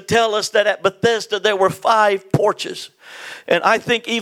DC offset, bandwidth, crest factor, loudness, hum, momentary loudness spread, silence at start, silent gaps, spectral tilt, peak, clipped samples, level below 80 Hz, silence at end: under 0.1%; 16.5 kHz; 18 dB; -17 LUFS; none; 17 LU; 0.1 s; none; -4 dB/octave; 0 dBFS; under 0.1%; -62 dBFS; 0 s